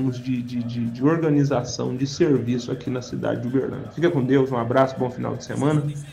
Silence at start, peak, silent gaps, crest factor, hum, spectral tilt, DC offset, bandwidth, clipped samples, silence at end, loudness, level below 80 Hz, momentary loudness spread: 0 s; -4 dBFS; none; 18 dB; none; -7 dB/octave; under 0.1%; 11 kHz; under 0.1%; 0 s; -23 LUFS; -56 dBFS; 8 LU